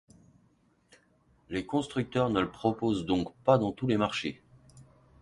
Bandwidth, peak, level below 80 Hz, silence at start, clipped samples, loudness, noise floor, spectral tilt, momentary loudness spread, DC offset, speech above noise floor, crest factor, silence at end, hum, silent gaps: 11.5 kHz; -8 dBFS; -58 dBFS; 1.5 s; under 0.1%; -30 LUFS; -67 dBFS; -6.5 dB/octave; 11 LU; under 0.1%; 38 dB; 22 dB; 0.4 s; none; none